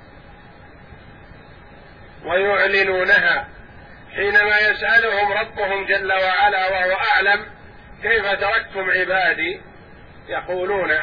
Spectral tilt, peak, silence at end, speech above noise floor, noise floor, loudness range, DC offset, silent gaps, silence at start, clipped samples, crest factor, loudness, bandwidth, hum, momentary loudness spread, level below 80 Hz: -5 dB/octave; -4 dBFS; 0 s; 25 dB; -43 dBFS; 4 LU; 0.2%; none; 0.15 s; under 0.1%; 16 dB; -18 LUFS; 5.2 kHz; none; 12 LU; -48 dBFS